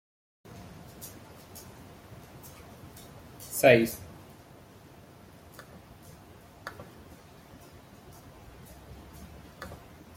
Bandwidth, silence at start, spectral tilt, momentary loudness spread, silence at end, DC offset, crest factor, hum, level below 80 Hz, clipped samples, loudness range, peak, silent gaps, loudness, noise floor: 16.5 kHz; 0.5 s; -4.5 dB/octave; 22 LU; 0.4 s; under 0.1%; 30 dB; none; -60 dBFS; under 0.1%; 20 LU; -4 dBFS; none; -25 LUFS; -52 dBFS